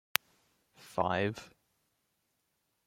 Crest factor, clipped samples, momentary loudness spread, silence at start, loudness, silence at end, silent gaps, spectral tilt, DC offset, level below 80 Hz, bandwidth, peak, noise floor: 38 dB; under 0.1%; 10 LU; 0.8 s; -34 LUFS; 1.4 s; none; -3.5 dB/octave; under 0.1%; -72 dBFS; 16.5 kHz; 0 dBFS; -80 dBFS